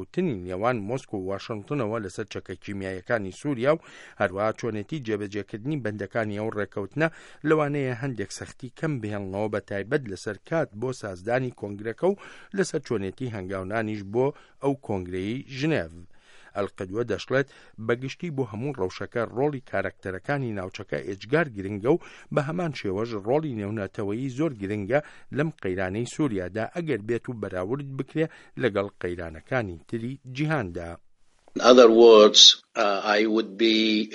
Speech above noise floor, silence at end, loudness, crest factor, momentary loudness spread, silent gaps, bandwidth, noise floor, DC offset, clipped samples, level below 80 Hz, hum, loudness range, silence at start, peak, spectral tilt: 30 dB; 0 s; -25 LUFS; 26 dB; 11 LU; none; 11.5 kHz; -55 dBFS; under 0.1%; under 0.1%; -60 dBFS; none; 13 LU; 0 s; 0 dBFS; -4.5 dB/octave